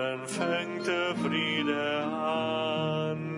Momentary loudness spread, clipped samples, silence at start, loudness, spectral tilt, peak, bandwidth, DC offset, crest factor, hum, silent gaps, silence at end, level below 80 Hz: 3 LU; under 0.1%; 0 s; -29 LUFS; -5 dB/octave; -16 dBFS; 11.5 kHz; under 0.1%; 14 dB; none; none; 0 s; -74 dBFS